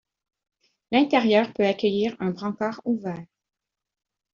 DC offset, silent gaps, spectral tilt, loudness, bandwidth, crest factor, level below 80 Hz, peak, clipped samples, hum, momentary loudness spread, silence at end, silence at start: under 0.1%; none; -4 dB/octave; -24 LUFS; 7.2 kHz; 20 dB; -68 dBFS; -6 dBFS; under 0.1%; none; 9 LU; 1.1 s; 0.9 s